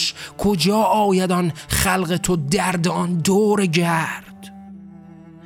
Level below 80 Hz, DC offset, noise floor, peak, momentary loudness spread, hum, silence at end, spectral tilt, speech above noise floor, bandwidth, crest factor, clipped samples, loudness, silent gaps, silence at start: -42 dBFS; under 0.1%; -42 dBFS; -4 dBFS; 13 LU; none; 0.15 s; -4.5 dB/octave; 23 dB; 17 kHz; 16 dB; under 0.1%; -19 LUFS; none; 0 s